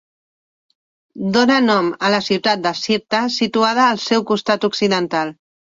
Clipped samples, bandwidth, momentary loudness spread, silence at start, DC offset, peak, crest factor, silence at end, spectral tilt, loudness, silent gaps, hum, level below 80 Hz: under 0.1%; 7.8 kHz; 6 LU; 1.15 s; under 0.1%; -2 dBFS; 16 dB; 0.45 s; -4.5 dB/octave; -17 LUFS; none; none; -60 dBFS